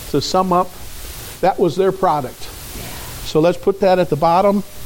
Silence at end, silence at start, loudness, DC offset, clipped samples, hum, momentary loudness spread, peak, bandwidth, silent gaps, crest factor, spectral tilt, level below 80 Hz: 0 s; 0 s; -16 LUFS; under 0.1%; under 0.1%; none; 16 LU; -2 dBFS; 17 kHz; none; 16 dB; -5.5 dB/octave; -38 dBFS